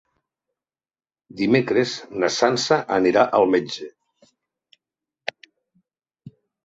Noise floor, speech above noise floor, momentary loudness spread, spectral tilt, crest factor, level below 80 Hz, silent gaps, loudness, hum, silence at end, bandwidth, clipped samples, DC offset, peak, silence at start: under -90 dBFS; over 70 dB; 16 LU; -4.5 dB/octave; 22 dB; -64 dBFS; none; -20 LUFS; none; 0.35 s; 8 kHz; under 0.1%; under 0.1%; -2 dBFS; 1.35 s